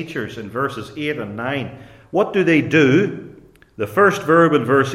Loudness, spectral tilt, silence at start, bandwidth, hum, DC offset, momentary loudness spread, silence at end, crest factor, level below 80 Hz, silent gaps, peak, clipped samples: -18 LUFS; -6.5 dB/octave; 0 s; 15.5 kHz; none; under 0.1%; 14 LU; 0 s; 16 dB; -56 dBFS; none; -2 dBFS; under 0.1%